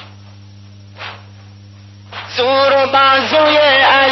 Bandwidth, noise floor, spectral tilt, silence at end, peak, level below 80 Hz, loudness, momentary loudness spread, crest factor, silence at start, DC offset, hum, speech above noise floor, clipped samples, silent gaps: 6.2 kHz; -37 dBFS; -4 dB/octave; 0 s; -2 dBFS; -58 dBFS; -11 LUFS; 21 LU; 12 dB; 0 s; under 0.1%; none; 27 dB; under 0.1%; none